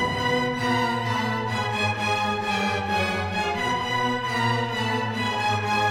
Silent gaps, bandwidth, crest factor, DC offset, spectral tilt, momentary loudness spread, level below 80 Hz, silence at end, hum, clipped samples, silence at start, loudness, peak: none; 16 kHz; 14 dB; under 0.1%; -4.5 dB/octave; 2 LU; -52 dBFS; 0 s; none; under 0.1%; 0 s; -24 LUFS; -10 dBFS